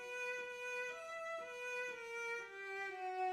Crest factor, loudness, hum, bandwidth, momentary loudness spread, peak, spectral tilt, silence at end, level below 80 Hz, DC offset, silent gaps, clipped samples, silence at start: 12 dB; -44 LUFS; none; 16 kHz; 3 LU; -32 dBFS; -1 dB/octave; 0 s; -88 dBFS; under 0.1%; none; under 0.1%; 0 s